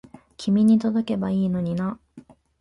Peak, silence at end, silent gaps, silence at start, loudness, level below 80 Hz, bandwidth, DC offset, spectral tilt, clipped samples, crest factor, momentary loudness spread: -10 dBFS; 0.4 s; none; 0.4 s; -22 LUFS; -56 dBFS; 11 kHz; under 0.1%; -8 dB/octave; under 0.1%; 12 dB; 13 LU